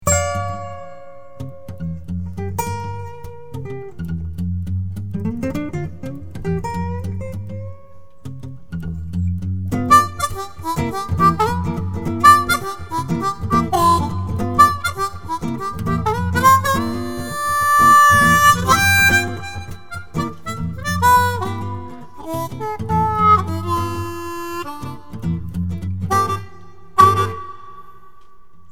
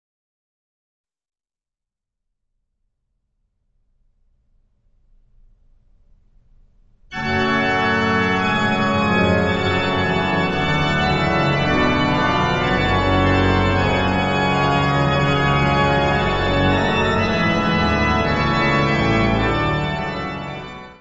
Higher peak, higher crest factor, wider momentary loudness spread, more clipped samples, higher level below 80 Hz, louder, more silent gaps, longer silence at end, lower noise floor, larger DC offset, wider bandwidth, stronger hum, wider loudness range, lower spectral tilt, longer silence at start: first, 0 dBFS vs -4 dBFS; about the same, 20 dB vs 16 dB; first, 20 LU vs 4 LU; neither; about the same, -38 dBFS vs -34 dBFS; about the same, -18 LUFS vs -18 LUFS; neither; first, 0.8 s vs 0.05 s; second, -49 dBFS vs under -90 dBFS; first, 2% vs under 0.1%; first, over 20 kHz vs 8 kHz; neither; first, 14 LU vs 4 LU; second, -4.5 dB/octave vs -6 dB/octave; second, 0 s vs 7.1 s